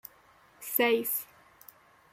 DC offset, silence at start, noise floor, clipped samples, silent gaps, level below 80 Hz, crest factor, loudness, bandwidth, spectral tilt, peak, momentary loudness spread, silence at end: under 0.1%; 0.6 s; -61 dBFS; under 0.1%; none; -78 dBFS; 20 dB; -28 LUFS; 16.5 kHz; -2 dB/octave; -12 dBFS; 23 LU; 0.9 s